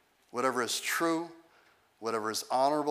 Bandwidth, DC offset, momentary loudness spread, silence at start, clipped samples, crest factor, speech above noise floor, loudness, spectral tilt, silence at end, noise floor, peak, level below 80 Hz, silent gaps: 16 kHz; under 0.1%; 11 LU; 0.35 s; under 0.1%; 18 dB; 34 dB; -31 LUFS; -2.5 dB/octave; 0 s; -65 dBFS; -14 dBFS; -88 dBFS; none